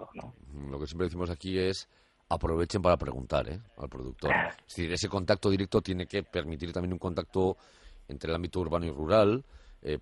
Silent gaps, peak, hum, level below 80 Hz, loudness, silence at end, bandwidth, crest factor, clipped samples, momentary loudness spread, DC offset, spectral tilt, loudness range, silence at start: none; -10 dBFS; none; -48 dBFS; -31 LUFS; 0 s; 11.5 kHz; 20 dB; under 0.1%; 15 LU; under 0.1%; -6 dB/octave; 2 LU; 0 s